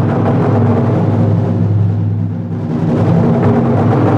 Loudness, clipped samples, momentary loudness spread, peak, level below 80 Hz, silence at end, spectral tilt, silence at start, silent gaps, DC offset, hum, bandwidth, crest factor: -13 LUFS; under 0.1%; 6 LU; 0 dBFS; -38 dBFS; 0 s; -10.5 dB/octave; 0 s; none; under 0.1%; none; 5.4 kHz; 10 dB